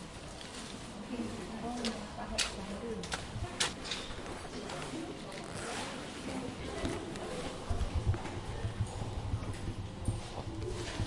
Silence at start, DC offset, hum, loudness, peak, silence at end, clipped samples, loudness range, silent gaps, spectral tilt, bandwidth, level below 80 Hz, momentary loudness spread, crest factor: 0 s; under 0.1%; none; -39 LUFS; -16 dBFS; 0 s; under 0.1%; 3 LU; none; -4.5 dB/octave; 11.5 kHz; -46 dBFS; 8 LU; 22 dB